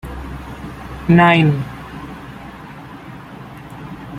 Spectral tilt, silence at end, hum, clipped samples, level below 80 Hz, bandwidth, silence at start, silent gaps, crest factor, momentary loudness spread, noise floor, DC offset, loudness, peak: -7.5 dB/octave; 0 s; none; under 0.1%; -38 dBFS; 12 kHz; 0.05 s; none; 18 dB; 23 LU; -35 dBFS; under 0.1%; -14 LUFS; -2 dBFS